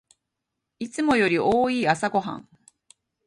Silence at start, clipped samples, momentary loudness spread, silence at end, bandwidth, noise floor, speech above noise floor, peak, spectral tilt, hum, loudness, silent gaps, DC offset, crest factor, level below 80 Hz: 0.8 s; under 0.1%; 16 LU; 0.85 s; 11.5 kHz; -82 dBFS; 60 dB; -6 dBFS; -5 dB/octave; none; -22 LUFS; none; under 0.1%; 18 dB; -60 dBFS